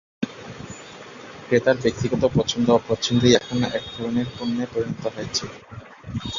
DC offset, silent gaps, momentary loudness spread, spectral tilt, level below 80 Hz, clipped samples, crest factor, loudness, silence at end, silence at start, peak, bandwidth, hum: under 0.1%; none; 21 LU; -5 dB/octave; -48 dBFS; under 0.1%; 22 dB; -22 LUFS; 0 s; 0.2 s; -2 dBFS; 7.4 kHz; none